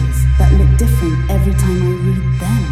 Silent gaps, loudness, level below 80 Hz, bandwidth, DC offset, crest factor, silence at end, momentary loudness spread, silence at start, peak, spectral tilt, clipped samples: none; -14 LUFS; -14 dBFS; 14.5 kHz; under 0.1%; 12 dB; 0 s; 5 LU; 0 s; 0 dBFS; -7 dB/octave; under 0.1%